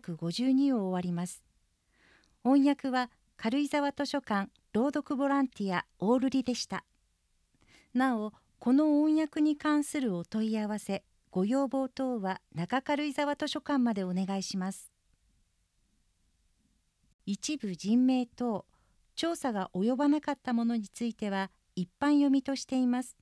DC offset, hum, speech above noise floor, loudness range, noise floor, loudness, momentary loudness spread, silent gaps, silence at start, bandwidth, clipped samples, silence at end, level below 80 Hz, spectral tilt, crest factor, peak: under 0.1%; none; 44 dB; 5 LU; -73 dBFS; -31 LUFS; 11 LU; 17.14-17.19 s; 0.05 s; 11 kHz; under 0.1%; 0.1 s; -70 dBFS; -5.5 dB/octave; 16 dB; -14 dBFS